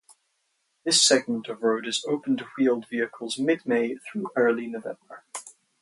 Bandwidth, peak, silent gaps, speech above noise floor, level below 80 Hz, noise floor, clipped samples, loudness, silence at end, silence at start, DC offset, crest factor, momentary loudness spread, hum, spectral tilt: 11.5 kHz; -6 dBFS; none; 48 dB; -78 dBFS; -74 dBFS; under 0.1%; -25 LUFS; 0.3 s; 0.85 s; under 0.1%; 22 dB; 19 LU; none; -2 dB/octave